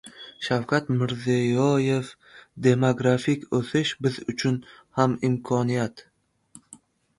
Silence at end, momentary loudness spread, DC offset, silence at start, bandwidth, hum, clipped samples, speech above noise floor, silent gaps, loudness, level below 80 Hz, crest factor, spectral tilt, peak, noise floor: 0.45 s; 8 LU; under 0.1%; 0.05 s; 11.5 kHz; none; under 0.1%; 31 dB; none; -24 LUFS; -62 dBFS; 20 dB; -6.5 dB/octave; -6 dBFS; -54 dBFS